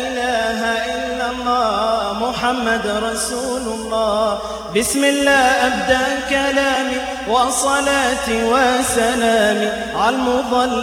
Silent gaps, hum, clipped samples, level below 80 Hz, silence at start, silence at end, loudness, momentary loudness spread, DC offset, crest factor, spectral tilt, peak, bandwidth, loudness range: none; none; under 0.1%; -42 dBFS; 0 s; 0 s; -17 LUFS; 6 LU; under 0.1%; 16 dB; -2.5 dB/octave; -2 dBFS; 19.5 kHz; 3 LU